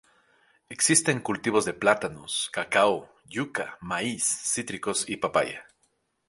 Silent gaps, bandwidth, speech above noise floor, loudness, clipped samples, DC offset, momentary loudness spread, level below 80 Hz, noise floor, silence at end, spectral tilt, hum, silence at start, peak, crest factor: none; 12 kHz; 45 dB; -26 LUFS; under 0.1%; under 0.1%; 12 LU; -64 dBFS; -72 dBFS; 0.65 s; -2.5 dB/octave; none; 0.7 s; -4 dBFS; 24 dB